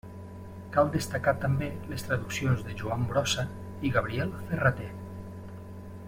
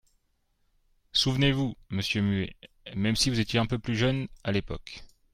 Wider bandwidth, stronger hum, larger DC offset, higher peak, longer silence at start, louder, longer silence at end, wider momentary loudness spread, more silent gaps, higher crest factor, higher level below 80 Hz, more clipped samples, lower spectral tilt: about the same, 16.5 kHz vs 15.5 kHz; neither; neither; about the same, -10 dBFS vs -10 dBFS; second, 0.05 s vs 1.15 s; about the same, -30 LUFS vs -28 LUFS; second, 0 s vs 0.3 s; about the same, 17 LU vs 15 LU; neither; about the same, 20 dB vs 20 dB; about the same, -52 dBFS vs -48 dBFS; neither; about the same, -5.5 dB/octave vs -5 dB/octave